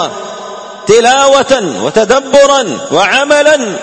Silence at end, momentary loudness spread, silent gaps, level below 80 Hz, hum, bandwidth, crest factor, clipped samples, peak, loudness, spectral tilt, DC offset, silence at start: 0 s; 15 LU; none; -46 dBFS; none; 11 kHz; 10 dB; 0.9%; 0 dBFS; -8 LUFS; -2.5 dB/octave; under 0.1%; 0 s